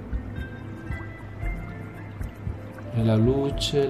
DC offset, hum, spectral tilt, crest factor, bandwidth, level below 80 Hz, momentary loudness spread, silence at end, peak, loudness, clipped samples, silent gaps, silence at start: 0.1%; none; -6.5 dB/octave; 16 dB; 13.5 kHz; -36 dBFS; 16 LU; 0 s; -10 dBFS; -29 LUFS; under 0.1%; none; 0 s